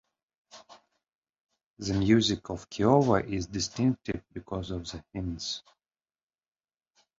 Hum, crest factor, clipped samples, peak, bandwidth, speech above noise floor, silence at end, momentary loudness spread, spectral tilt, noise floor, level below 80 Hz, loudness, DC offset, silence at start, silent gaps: none; 24 dB; under 0.1%; -8 dBFS; 7.8 kHz; over 62 dB; 1.6 s; 15 LU; -5.5 dB/octave; under -90 dBFS; -50 dBFS; -29 LUFS; under 0.1%; 0.55 s; 1.15-1.22 s, 1.41-1.49 s, 1.66-1.74 s